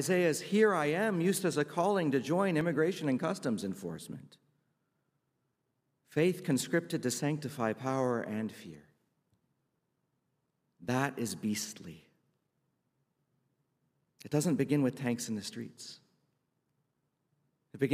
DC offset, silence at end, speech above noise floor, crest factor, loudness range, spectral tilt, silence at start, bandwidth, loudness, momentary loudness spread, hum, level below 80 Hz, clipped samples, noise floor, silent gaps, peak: under 0.1%; 0 s; 49 dB; 20 dB; 9 LU; -5.5 dB/octave; 0 s; 15.5 kHz; -32 LUFS; 15 LU; none; -78 dBFS; under 0.1%; -81 dBFS; none; -14 dBFS